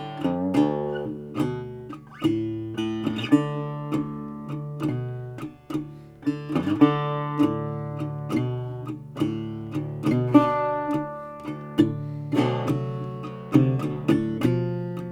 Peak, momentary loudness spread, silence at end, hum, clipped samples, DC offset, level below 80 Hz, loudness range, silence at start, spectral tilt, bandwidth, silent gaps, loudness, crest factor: -2 dBFS; 14 LU; 0 s; none; under 0.1%; under 0.1%; -58 dBFS; 4 LU; 0 s; -8 dB/octave; 13 kHz; none; -26 LUFS; 22 dB